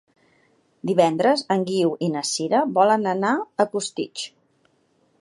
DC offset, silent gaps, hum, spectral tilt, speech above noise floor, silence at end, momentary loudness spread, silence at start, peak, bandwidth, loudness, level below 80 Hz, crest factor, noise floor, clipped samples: under 0.1%; none; none; -4.5 dB/octave; 43 dB; 0.9 s; 11 LU; 0.85 s; -2 dBFS; 11.5 kHz; -22 LUFS; -76 dBFS; 20 dB; -64 dBFS; under 0.1%